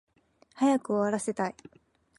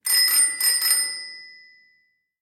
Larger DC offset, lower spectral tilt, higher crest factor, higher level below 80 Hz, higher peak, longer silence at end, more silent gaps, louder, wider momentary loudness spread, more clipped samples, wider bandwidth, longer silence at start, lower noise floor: neither; first, -5.5 dB/octave vs 5 dB/octave; about the same, 16 dB vs 18 dB; first, -74 dBFS vs -82 dBFS; second, -16 dBFS vs -6 dBFS; second, 0.65 s vs 0.9 s; neither; second, -29 LUFS vs -17 LUFS; second, 7 LU vs 20 LU; neither; second, 11.5 kHz vs 16.5 kHz; first, 0.55 s vs 0.05 s; about the same, -65 dBFS vs -66 dBFS